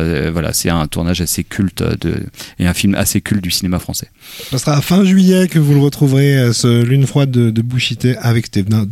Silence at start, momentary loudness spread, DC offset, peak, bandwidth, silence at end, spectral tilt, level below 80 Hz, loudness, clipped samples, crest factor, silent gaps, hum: 0 s; 9 LU; under 0.1%; -2 dBFS; 16.5 kHz; 0 s; -5.5 dB/octave; -36 dBFS; -14 LUFS; under 0.1%; 12 dB; none; none